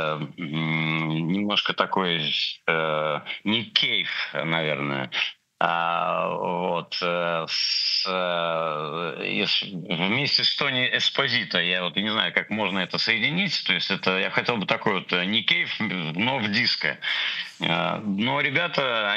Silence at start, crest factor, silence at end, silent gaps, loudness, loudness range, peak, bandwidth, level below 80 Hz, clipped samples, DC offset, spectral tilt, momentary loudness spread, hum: 0 s; 22 dB; 0 s; none; -23 LUFS; 2 LU; -4 dBFS; 8.4 kHz; -72 dBFS; under 0.1%; under 0.1%; -4.5 dB/octave; 6 LU; none